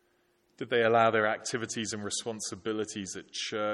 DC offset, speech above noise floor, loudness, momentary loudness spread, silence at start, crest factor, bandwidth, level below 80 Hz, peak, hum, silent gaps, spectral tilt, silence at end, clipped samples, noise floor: under 0.1%; 40 dB; -30 LUFS; 12 LU; 0.6 s; 20 dB; 13 kHz; -74 dBFS; -10 dBFS; none; none; -3 dB/octave; 0 s; under 0.1%; -71 dBFS